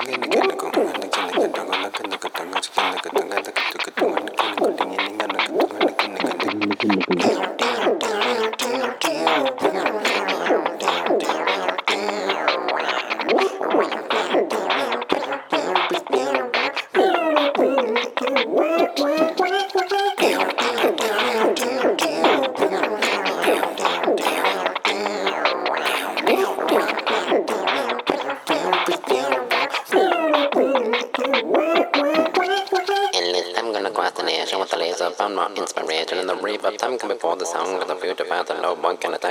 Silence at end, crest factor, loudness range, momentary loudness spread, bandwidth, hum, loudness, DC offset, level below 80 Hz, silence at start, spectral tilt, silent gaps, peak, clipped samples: 0 s; 20 dB; 3 LU; 5 LU; 19 kHz; none; -21 LUFS; under 0.1%; -74 dBFS; 0 s; -2.5 dB/octave; none; -2 dBFS; under 0.1%